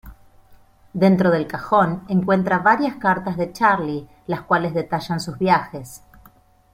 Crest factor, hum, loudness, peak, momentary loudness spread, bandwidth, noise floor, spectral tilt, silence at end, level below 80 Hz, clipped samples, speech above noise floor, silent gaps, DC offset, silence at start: 18 dB; none; -20 LUFS; -2 dBFS; 12 LU; 15.5 kHz; -53 dBFS; -7 dB/octave; 0.75 s; -52 dBFS; under 0.1%; 33 dB; none; under 0.1%; 0.05 s